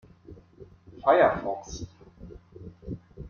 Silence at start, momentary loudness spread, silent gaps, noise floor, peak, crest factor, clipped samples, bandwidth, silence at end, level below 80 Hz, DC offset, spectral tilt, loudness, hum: 0.3 s; 27 LU; none; -52 dBFS; -8 dBFS; 22 dB; under 0.1%; 7.2 kHz; 0 s; -52 dBFS; under 0.1%; -5.5 dB/octave; -24 LUFS; none